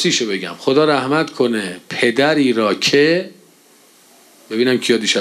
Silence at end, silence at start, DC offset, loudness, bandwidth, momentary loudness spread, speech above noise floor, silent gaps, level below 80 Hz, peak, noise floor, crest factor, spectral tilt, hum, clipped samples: 0 s; 0 s; under 0.1%; -16 LUFS; 14 kHz; 8 LU; 34 dB; none; -68 dBFS; -2 dBFS; -49 dBFS; 16 dB; -3.5 dB/octave; none; under 0.1%